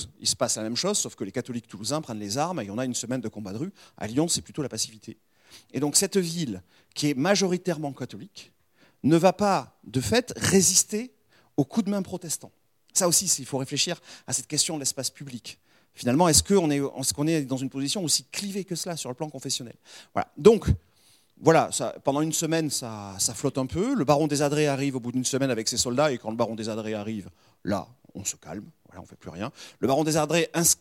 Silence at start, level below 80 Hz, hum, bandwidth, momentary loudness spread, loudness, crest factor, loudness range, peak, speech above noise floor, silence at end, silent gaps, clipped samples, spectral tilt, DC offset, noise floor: 0 s; -50 dBFS; none; 16.5 kHz; 16 LU; -25 LUFS; 24 dB; 6 LU; -2 dBFS; 35 dB; 0.05 s; none; under 0.1%; -3.5 dB/octave; under 0.1%; -62 dBFS